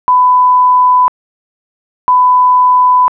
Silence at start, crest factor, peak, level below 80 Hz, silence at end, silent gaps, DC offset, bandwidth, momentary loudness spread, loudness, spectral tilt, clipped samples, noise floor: 0.1 s; 4 dB; -4 dBFS; -60 dBFS; 0.05 s; 1.08-2.08 s; under 0.1%; 2.4 kHz; 5 LU; -8 LUFS; -3 dB/octave; under 0.1%; under -90 dBFS